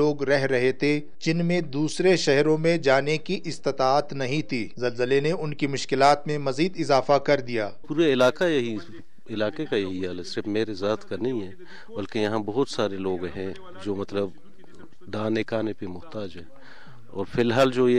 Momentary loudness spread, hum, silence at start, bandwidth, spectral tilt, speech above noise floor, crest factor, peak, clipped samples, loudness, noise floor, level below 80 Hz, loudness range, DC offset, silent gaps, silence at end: 14 LU; none; 0 s; 11 kHz; -5.5 dB/octave; 26 dB; 16 dB; -8 dBFS; under 0.1%; -25 LUFS; -51 dBFS; -60 dBFS; 8 LU; 2%; none; 0 s